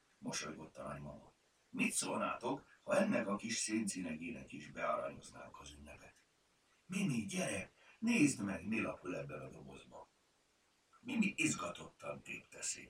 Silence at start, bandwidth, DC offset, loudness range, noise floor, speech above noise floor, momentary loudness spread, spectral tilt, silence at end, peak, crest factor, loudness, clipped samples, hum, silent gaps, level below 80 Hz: 0.2 s; 16 kHz; under 0.1%; 5 LU; -76 dBFS; 36 dB; 20 LU; -4 dB/octave; 0 s; -20 dBFS; 22 dB; -40 LUFS; under 0.1%; none; none; -72 dBFS